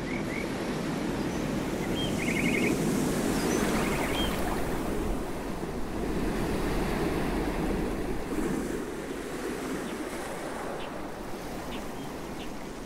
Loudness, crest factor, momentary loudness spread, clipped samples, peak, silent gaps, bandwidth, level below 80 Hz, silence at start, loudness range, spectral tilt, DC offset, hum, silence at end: -31 LUFS; 16 dB; 10 LU; under 0.1%; -14 dBFS; none; 16 kHz; -40 dBFS; 0 s; 8 LU; -5 dB/octave; under 0.1%; none; 0 s